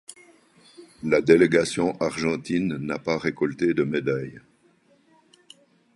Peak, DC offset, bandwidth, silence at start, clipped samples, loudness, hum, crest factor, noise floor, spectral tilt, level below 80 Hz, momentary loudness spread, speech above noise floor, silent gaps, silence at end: -2 dBFS; under 0.1%; 11.5 kHz; 0.1 s; under 0.1%; -23 LUFS; none; 22 dB; -61 dBFS; -6 dB/octave; -58 dBFS; 12 LU; 38 dB; none; 1.55 s